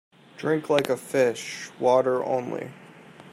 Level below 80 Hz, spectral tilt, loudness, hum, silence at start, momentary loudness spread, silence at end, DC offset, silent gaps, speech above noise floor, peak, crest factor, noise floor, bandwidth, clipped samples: -74 dBFS; -5 dB/octave; -25 LUFS; none; 0.35 s; 13 LU; 0 s; under 0.1%; none; 23 dB; -4 dBFS; 22 dB; -47 dBFS; 15.5 kHz; under 0.1%